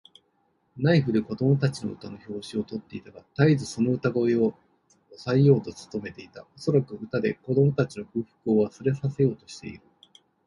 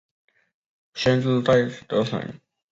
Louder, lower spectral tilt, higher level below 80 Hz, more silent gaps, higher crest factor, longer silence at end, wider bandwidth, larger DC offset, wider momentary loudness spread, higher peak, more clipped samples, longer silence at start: second, -25 LUFS vs -22 LUFS; about the same, -7.5 dB/octave vs -6.5 dB/octave; about the same, -60 dBFS vs -56 dBFS; neither; about the same, 20 dB vs 18 dB; first, 0.7 s vs 0.35 s; first, 11 kHz vs 7.8 kHz; neither; first, 17 LU vs 14 LU; about the same, -6 dBFS vs -6 dBFS; neither; second, 0.75 s vs 0.95 s